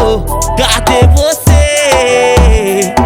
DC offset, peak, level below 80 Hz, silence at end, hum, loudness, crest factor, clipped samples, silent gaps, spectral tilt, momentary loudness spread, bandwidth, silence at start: under 0.1%; 0 dBFS; -14 dBFS; 0 s; none; -9 LUFS; 8 dB; 0.8%; none; -4.5 dB/octave; 4 LU; 18.5 kHz; 0 s